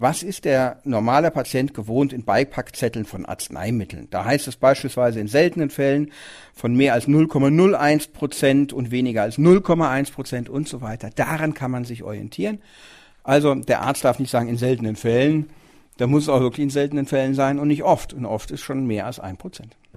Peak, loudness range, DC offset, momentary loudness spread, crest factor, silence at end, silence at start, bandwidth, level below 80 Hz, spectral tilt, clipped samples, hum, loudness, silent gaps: -2 dBFS; 5 LU; under 0.1%; 13 LU; 18 dB; 0.3 s; 0 s; 15.5 kHz; -50 dBFS; -6 dB/octave; under 0.1%; none; -21 LUFS; none